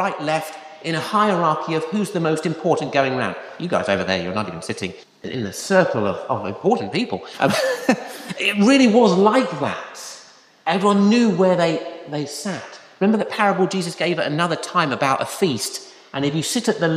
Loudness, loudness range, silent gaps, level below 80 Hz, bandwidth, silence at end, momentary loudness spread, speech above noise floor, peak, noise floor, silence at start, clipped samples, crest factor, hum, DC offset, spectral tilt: -20 LUFS; 5 LU; none; -64 dBFS; 15 kHz; 0 s; 13 LU; 27 dB; -2 dBFS; -47 dBFS; 0 s; under 0.1%; 18 dB; none; under 0.1%; -5 dB/octave